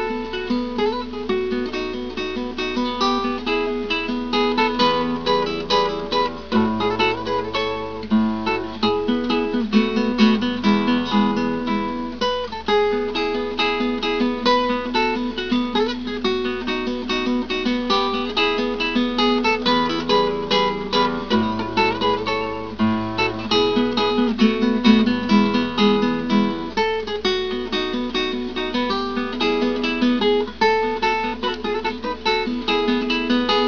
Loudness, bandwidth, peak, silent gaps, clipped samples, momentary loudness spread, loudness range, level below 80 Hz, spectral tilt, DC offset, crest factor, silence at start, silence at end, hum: -20 LUFS; 5.4 kHz; -2 dBFS; none; under 0.1%; 6 LU; 4 LU; -44 dBFS; -5.5 dB/octave; 0.9%; 18 dB; 0 s; 0 s; none